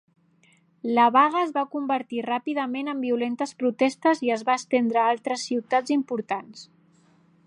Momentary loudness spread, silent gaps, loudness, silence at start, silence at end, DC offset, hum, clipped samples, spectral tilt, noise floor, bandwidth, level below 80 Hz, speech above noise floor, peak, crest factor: 9 LU; none; -24 LUFS; 0.85 s; 0.85 s; under 0.1%; none; under 0.1%; -4 dB/octave; -61 dBFS; 11 kHz; -82 dBFS; 37 dB; -6 dBFS; 18 dB